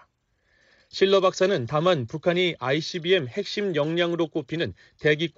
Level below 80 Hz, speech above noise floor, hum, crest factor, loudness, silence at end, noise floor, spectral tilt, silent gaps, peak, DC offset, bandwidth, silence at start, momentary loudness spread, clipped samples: -64 dBFS; 45 dB; none; 18 dB; -24 LUFS; 0.05 s; -69 dBFS; -3.5 dB/octave; none; -8 dBFS; under 0.1%; 7.8 kHz; 0.95 s; 9 LU; under 0.1%